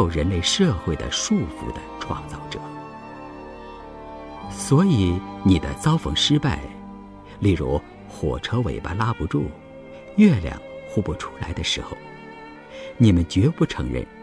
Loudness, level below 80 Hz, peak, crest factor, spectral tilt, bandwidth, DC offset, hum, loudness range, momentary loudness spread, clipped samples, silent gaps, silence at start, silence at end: -22 LUFS; -38 dBFS; -4 dBFS; 18 dB; -5.5 dB/octave; 11 kHz; under 0.1%; none; 6 LU; 21 LU; under 0.1%; none; 0 s; 0 s